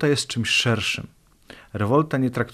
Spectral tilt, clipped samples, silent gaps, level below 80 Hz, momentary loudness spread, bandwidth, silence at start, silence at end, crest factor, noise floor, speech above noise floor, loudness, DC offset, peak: -4.5 dB/octave; under 0.1%; none; -56 dBFS; 12 LU; 14 kHz; 0 s; 0 s; 16 dB; -48 dBFS; 26 dB; -22 LUFS; under 0.1%; -6 dBFS